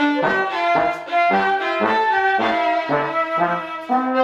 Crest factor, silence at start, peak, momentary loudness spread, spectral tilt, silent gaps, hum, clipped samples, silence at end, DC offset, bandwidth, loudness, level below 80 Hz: 14 dB; 0 s; -4 dBFS; 4 LU; -5.5 dB/octave; none; none; under 0.1%; 0 s; under 0.1%; 9.2 kHz; -19 LUFS; -58 dBFS